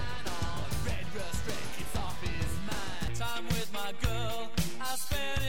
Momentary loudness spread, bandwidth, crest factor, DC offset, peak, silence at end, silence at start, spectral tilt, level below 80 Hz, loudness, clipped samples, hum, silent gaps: 4 LU; 17.5 kHz; 20 dB; 3%; -16 dBFS; 0 s; 0 s; -4 dB/octave; -42 dBFS; -36 LUFS; under 0.1%; none; none